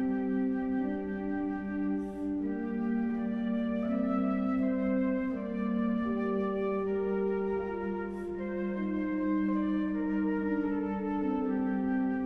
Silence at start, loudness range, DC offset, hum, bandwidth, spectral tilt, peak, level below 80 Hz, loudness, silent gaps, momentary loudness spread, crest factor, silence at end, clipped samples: 0 s; 2 LU; under 0.1%; none; 4.8 kHz; -9.5 dB/octave; -20 dBFS; -56 dBFS; -32 LUFS; none; 4 LU; 12 dB; 0 s; under 0.1%